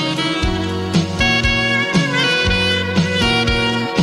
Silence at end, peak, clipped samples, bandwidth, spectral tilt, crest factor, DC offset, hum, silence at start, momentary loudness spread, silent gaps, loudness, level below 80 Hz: 0 s; -2 dBFS; under 0.1%; 12.5 kHz; -4.5 dB/octave; 14 dB; under 0.1%; none; 0 s; 4 LU; none; -16 LUFS; -30 dBFS